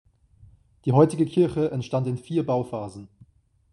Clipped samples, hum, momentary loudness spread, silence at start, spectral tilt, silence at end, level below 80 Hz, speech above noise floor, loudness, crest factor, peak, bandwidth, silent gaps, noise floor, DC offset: under 0.1%; none; 14 LU; 0.85 s; -8.5 dB/octave; 0.65 s; -58 dBFS; 36 dB; -24 LUFS; 20 dB; -6 dBFS; 11.5 kHz; none; -59 dBFS; under 0.1%